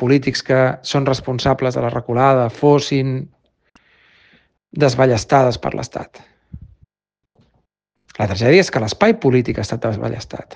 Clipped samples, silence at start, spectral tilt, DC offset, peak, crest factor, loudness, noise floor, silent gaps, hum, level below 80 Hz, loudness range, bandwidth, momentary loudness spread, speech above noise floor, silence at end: under 0.1%; 0 s; -6 dB/octave; under 0.1%; 0 dBFS; 18 dB; -17 LUFS; -82 dBFS; none; none; -48 dBFS; 4 LU; 9.4 kHz; 13 LU; 66 dB; 0.1 s